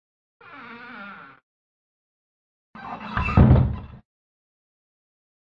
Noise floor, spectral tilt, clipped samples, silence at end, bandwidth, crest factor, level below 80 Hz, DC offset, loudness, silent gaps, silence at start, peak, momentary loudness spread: -42 dBFS; -10 dB/octave; under 0.1%; 1.7 s; 5.2 kHz; 24 dB; -34 dBFS; under 0.1%; -19 LUFS; 1.43-2.73 s; 0.7 s; -2 dBFS; 25 LU